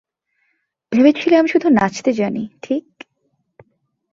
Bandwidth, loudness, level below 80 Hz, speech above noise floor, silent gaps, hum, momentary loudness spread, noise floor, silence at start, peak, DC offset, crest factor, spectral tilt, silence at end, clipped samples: 7.6 kHz; -16 LUFS; -58 dBFS; 53 dB; none; none; 11 LU; -68 dBFS; 0.9 s; -2 dBFS; under 0.1%; 16 dB; -6 dB/octave; 1.35 s; under 0.1%